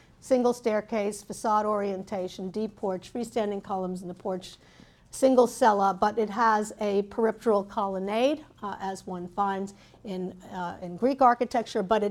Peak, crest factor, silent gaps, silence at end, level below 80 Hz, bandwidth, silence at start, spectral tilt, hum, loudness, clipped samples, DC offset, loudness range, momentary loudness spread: -8 dBFS; 20 dB; none; 0 s; -62 dBFS; 15 kHz; 0.25 s; -5.5 dB/octave; none; -27 LUFS; under 0.1%; under 0.1%; 6 LU; 13 LU